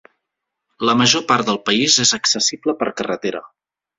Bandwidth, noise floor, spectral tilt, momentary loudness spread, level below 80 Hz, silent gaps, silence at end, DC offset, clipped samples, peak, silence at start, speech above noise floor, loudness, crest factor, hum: 7.8 kHz; -80 dBFS; -2 dB/octave; 10 LU; -58 dBFS; none; 0.5 s; under 0.1%; under 0.1%; 0 dBFS; 0.8 s; 62 dB; -16 LUFS; 18 dB; none